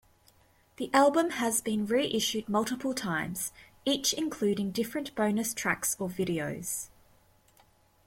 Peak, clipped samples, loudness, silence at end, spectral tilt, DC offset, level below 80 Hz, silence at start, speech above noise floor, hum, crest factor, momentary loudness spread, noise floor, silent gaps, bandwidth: -12 dBFS; under 0.1%; -30 LUFS; 1.2 s; -3.5 dB/octave; under 0.1%; -64 dBFS; 0.8 s; 34 dB; none; 18 dB; 10 LU; -64 dBFS; none; 16.5 kHz